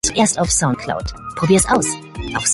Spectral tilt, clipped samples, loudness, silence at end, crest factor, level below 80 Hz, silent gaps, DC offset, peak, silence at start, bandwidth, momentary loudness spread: -3.5 dB/octave; under 0.1%; -17 LUFS; 0 s; 16 dB; -34 dBFS; none; under 0.1%; -2 dBFS; 0.05 s; 12 kHz; 12 LU